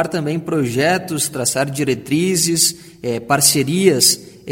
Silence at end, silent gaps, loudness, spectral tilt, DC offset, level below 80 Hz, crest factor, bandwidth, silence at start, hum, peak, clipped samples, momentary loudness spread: 0 s; none; -16 LUFS; -3 dB/octave; under 0.1%; -56 dBFS; 18 dB; 17 kHz; 0 s; none; 0 dBFS; under 0.1%; 9 LU